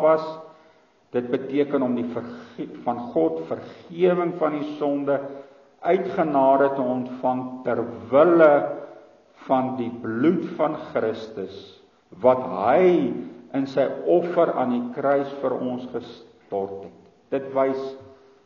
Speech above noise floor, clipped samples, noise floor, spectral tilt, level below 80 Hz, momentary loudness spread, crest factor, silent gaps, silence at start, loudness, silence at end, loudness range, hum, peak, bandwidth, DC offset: 35 dB; under 0.1%; -57 dBFS; -6 dB/octave; -70 dBFS; 17 LU; 20 dB; none; 0 s; -23 LUFS; 0.3 s; 6 LU; none; -4 dBFS; 6.8 kHz; under 0.1%